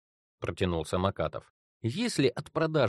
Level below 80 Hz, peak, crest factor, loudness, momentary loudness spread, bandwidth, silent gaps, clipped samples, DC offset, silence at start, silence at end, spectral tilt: -54 dBFS; -10 dBFS; 20 dB; -31 LUFS; 10 LU; 12.5 kHz; 1.50-1.80 s; under 0.1%; under 0.1%; 0.4 s; 0 s; -5.5 dB/octave